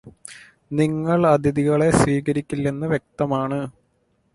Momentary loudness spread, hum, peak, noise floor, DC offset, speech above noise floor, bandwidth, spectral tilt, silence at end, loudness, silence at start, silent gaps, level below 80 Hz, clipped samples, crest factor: 15 LU; none; -2 dBFS; -66 dBFS; under 0.1%; 46 dB; 11.5 kHz; -7 dB/octave; 0.65 s; -21 LUFS; 0.05 s; none; -46 dBFS; under 0.1%; 18 dB